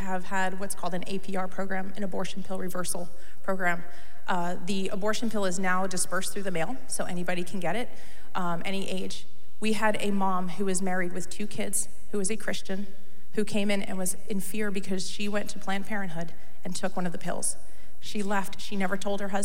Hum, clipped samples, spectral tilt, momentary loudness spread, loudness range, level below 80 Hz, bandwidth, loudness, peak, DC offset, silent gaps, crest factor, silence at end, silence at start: none; under 0.1%; -4 dB/octave; 9 LU; 3 LU; -58 dBFS; 16.5 kHz; -31 LUFS; -10 dBFS; 8%; none; 18 dB; 0 s; 0 s